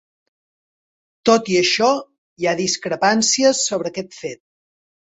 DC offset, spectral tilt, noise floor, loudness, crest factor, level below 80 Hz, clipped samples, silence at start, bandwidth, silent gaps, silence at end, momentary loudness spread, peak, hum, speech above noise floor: under 0.1%; -2.5 dB/octave; under -90 dBFS; -18 LUFS; 18 dB; -64 dBFS; under 0.1%; 1.25 s; 8.4 kHz; 2.18-2.36 s; 0.8 s; 13 LU; -2 dBFS; none; over 72 dB